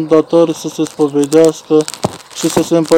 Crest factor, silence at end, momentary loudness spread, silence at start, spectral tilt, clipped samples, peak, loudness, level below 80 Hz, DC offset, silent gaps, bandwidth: 12 dB; 0 s; 10 LU; 0 s; -5 dB/octave; 0.9%; 0 dBFS; -13 LUFS; -52 dBFS; under 0.1%; none; 17 kHz